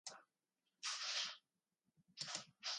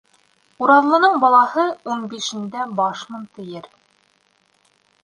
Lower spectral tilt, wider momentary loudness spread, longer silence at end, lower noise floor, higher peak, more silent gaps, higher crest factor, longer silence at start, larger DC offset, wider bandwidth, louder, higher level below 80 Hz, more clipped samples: second, 1 dB/octave vs -4 dB/octave; about the same, 19 LU vs 21 LU; second, 0 s vs 1.35 s; first, under -90 dBFS vs -62 dBFS; second, -30 dBFS vs -2 dBFS; neither; about the same, 22 dB vs 18 dB; second, 0.05 s vs 0.6 s; neither; about the same, 11 kHz vs 11 kHz; second, -45 LUFS vs -17 LUFS; second, under -90 dBFS vs -72 dBFS; neither